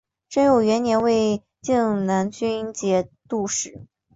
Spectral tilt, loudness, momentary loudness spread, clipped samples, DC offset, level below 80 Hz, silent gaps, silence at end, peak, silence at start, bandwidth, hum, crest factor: -5 dB/octave; -22 LUFS; 9 LU; under 0.1%; under 0.1%; -56 dBFS; none; 0.3 s; -6 dBFS; 0.3 s; 8 kHz; none; 16 dB